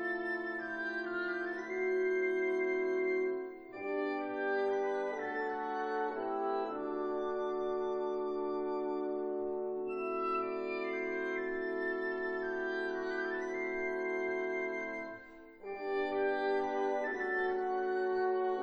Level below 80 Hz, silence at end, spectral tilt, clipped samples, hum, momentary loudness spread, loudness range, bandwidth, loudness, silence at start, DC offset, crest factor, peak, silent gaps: -70 dBFS; 0 s; -5.5 dB/octave; under 0.1%; none; 5 LU; 2 LU; 6.6 kHz; -36 LUFS; 0 s; under 0.1%; 12 dB; -22 dBFS; none